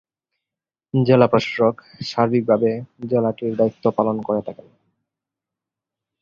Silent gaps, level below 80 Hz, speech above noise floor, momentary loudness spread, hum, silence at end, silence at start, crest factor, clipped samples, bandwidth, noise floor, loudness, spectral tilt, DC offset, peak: none; -58 dBFS; 69 dB; 11 LU; none; 1.7 s; 0.95 s; 20 dB; under 0.1%; 7.4 kHz; -88 dBFS; -20 LUFS; -7.5 dB/octave; under 0.1%; -2 dBFS